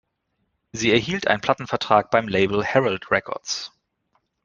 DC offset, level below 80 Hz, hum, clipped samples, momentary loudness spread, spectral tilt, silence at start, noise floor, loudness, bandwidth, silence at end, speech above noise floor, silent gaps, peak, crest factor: under 0.1%; -56 dBFS; none; under 0.1%; 9 LU; -4 dB/octave; 0.75 s; -74 dBFS; -21 LUFS; 9.6 kHz; 0.8 s; 52 dB; none; 0 dBFS; 22 dB